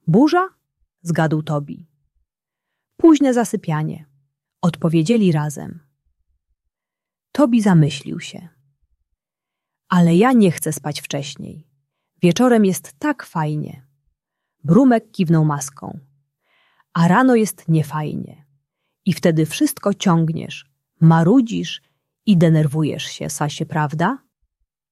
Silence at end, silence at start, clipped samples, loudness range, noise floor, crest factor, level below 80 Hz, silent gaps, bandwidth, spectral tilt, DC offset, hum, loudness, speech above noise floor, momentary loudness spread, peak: 0.75 s; 0.05 s; under 0.1%; 4 LU; -87 dBFS; 16 dB; -60 dBFS; none; 14 kHz; -6.5 dB/octave; under 0.1%; none; -18 LUFS; 70 dB; 17 LU; -2 dBFS